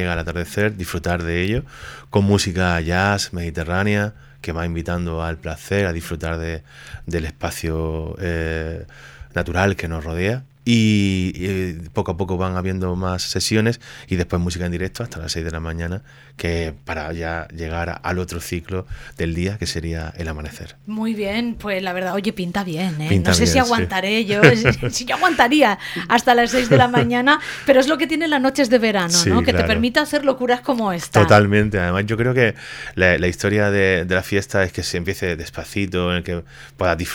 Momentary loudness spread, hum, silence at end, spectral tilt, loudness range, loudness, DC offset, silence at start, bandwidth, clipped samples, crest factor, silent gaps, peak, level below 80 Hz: 13 LU; none; 0 s; -5 dB/octave; 10 LU; -19 LUFS; under 0.1%; 0 s; 17.5 kHz; under 0.1%; 20 dB; none; 0 dBFS; -38 dBFS